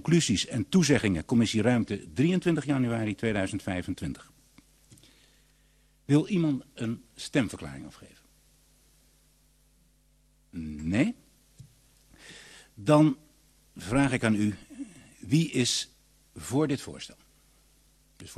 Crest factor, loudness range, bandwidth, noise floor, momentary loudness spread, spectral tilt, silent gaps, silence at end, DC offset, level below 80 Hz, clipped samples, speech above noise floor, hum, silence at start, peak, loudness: 20 dB; 9 LU; 13 kHz; -64 dBFS; 20 LU; -5.5 dB/octave; none; 0.05 s; under 0.1%; -56 dBFS; under 0.1%; 38 dB; none; 0.05 s; -10 dBFS; -27 LUFS